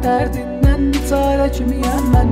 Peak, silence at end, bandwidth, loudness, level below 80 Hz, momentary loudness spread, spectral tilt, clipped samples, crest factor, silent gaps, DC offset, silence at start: -4 dBFS; 0 s; 16 kHz; -17 LUFS; -20 dBFS; 4 LU; -7 dB/octave; under 0.1%; 12 dB; none; under 0.1%; 0 s